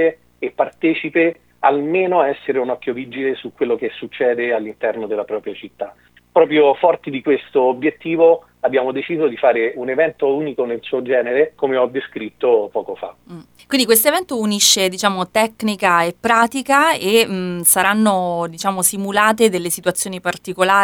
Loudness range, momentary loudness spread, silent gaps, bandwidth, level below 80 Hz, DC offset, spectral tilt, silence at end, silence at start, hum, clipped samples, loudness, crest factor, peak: 5 LU; 10 LU; none; 20 kHz; -62 dBFS; under 0.1%; -3 dB/octave; 0 s; 0 s; none; under 0.1%; -17 LUFS; 16 dB; 0 dBFS